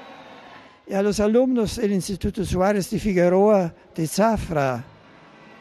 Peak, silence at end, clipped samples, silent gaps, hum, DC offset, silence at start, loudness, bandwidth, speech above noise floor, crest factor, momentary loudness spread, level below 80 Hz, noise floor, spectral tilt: -6 dBFS; 0.75 s; under 0.1%; none; none; under 0.1%; 0 s; -21 LUFS; 13.5 kHz; 28 dB; 16 dB; 11 LU; -42 dBFS; -48 dBFS; -6 dB/octave